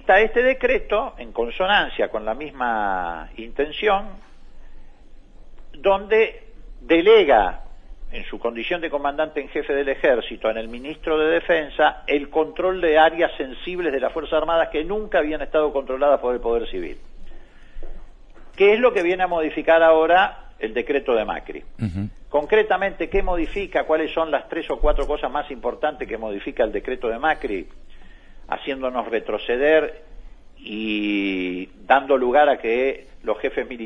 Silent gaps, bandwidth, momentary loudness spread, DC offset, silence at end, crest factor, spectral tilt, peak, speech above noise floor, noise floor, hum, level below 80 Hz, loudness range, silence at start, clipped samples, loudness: none; 6.8 kHz; 13 LU; under 0.1%; 0 s; 18 dB; -6.5 dB/octave; -2 dBFS; 22 dB; -42 dBFS; none; -36 dBFS; 6 LU; 0 s; under 0.1%; -21 LUFS